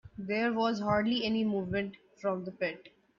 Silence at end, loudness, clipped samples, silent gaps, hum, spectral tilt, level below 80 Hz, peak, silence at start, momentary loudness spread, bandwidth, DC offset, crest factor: 0.3 s; -32 LUFS; under 0.1%; none; none; -6.5 dB/octave; -62 dBFS; -16 dBFS; 0.05 s; 8 LU; 7.2 kHz; under 0.1%; 16 dB